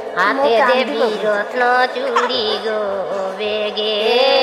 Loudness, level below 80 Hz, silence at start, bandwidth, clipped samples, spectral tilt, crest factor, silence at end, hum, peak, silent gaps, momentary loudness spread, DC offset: -17 LUFS; -64 dBFS; 0 s; 14 kHz; under 0.1%; -3 dB/octave; 14 dB; 0 s; none; -2 dBFS; none; 7 LU; under 0.1%